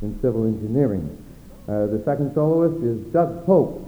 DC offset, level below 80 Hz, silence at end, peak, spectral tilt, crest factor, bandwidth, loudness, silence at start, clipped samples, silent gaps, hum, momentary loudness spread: under 0.1%; -44 dBFS; 0 s; -4 dBFS; -10.5 dB/octave; 18 dB; over 20 kHz; -21 LUFS; 0 s; under 0.1%; none; none; 10 LU